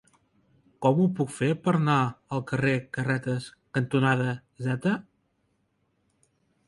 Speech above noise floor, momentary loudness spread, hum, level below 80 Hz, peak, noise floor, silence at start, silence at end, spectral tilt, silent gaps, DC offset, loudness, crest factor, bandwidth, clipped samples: 47 dB; 9 LU; none; -64 dBFS; -8 dBFS; -72 dBFS; 0.8 s; 1.65 s; -7 dB/octave; none; under 0.1%; -27 LUFS; 20 dB; 11.5 kHz; under 0.1%